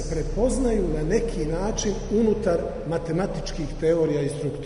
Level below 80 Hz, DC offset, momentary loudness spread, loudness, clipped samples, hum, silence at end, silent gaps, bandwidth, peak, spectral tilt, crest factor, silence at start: -32 dBFS; under 0.1%; 7 LU; -25 LUFS; under 0.1%; none; 0 s; none; 11 kHz; -10 dBFS; -6 dB/octave; 14 dB; 0 s